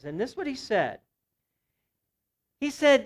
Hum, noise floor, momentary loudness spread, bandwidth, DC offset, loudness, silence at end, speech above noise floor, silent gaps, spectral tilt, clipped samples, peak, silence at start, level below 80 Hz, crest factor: none; -82 dBFS; 11 LU; 13 kHz; under 0.1%; -28 LUFS; 0 s; 57 dB; none; -4 dB/octave; under 0.1%; -10 dBFS; 0.05 s; -66 dBFS; 18 dB